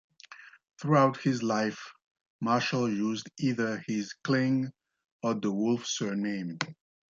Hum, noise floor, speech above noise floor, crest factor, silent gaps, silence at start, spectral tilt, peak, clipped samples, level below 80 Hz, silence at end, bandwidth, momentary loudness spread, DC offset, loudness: none; -52 dBFS; 23 dB; 20 dB; 2.06-2.15 s, 2.21-2.39 s, 5.05-5.20 s; 0.3 s; -5.5 dB/octave; -10 dBFS; under 0.1%; -74 dBFS; 0.4 s; 7.6 kHz; 12 LU; under 0.1%; -30 LUFS